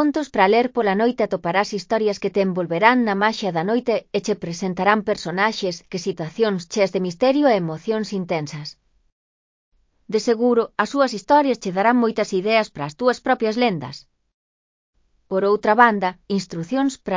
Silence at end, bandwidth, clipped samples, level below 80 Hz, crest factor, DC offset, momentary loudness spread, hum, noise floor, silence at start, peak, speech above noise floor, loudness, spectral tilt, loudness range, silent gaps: 0 s; 7.6 kHz; under 0.1%; -60 dBFS; 20 dB; under 0.1%; 10 LU; none; under -90 dBFS; 0 s; 0 dBFS; over 70 dB; -20 LUFS; -5.5 dB/octave; 4 LU; 9.12-9.72 s, 14.34-14.93 s